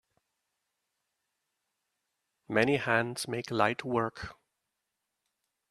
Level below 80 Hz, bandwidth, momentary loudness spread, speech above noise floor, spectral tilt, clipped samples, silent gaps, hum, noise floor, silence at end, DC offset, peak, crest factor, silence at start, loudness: -68 dBFS; 13.5 kHz; 9 LU; 55 dB; -5 dB/octave; under 0.1%; none; none; -85 dBFS; 1.4 s; under 0.1%; -10 dBFS; 26 dB; 2.5 s; -30 LUFS